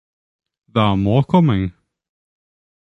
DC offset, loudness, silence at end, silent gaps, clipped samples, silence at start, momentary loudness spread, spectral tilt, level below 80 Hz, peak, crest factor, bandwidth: under 0.1%; -17 LUFS; 1.15 s; none; under 0.1%; 0.75 s; 8 LU; -9 dB/octave; -42 dBFS; -2 dBFS; 18 dB; 6.2 kHz